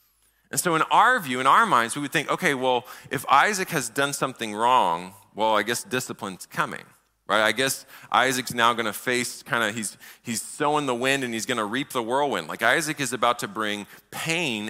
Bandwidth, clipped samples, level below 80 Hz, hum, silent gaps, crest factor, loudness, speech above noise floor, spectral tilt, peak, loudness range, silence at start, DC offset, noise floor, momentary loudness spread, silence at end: 16 kHz; under 0.1%; -68 dBFS; none; none; 20 dB; -24 LUFS; 40 dB; -3 dB/octave; -6 dBFS; 4 LU; 0.55 s; under 0.1%; -64 dBFS; 12 LU; 0 s